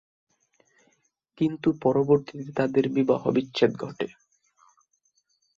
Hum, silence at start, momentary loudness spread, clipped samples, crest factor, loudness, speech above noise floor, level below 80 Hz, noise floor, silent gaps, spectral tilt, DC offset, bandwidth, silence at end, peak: none; 1.4 s; 11 LU; under 0.1%; 20 dB; -25 LUFS; 47 dB; -66 dBFS; -71 dBFS; none; -7.5 dB/octave; under 0.1%; 7.4 kHz; 1.5 s; -6 dBFS